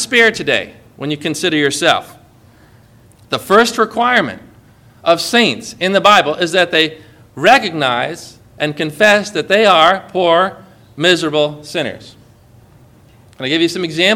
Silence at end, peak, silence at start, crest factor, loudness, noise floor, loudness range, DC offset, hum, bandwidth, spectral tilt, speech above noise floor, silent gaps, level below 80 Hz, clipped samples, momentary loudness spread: 0 s; 0 dBFS; 0 s; 16 dB; -13 LUFS; -45 dBFS; 5 LU; under 0.1%; none; over 20 kHz; -3.5 dB/octave; 32 dB; none; -54 dBFS; 0.3%; 12 LU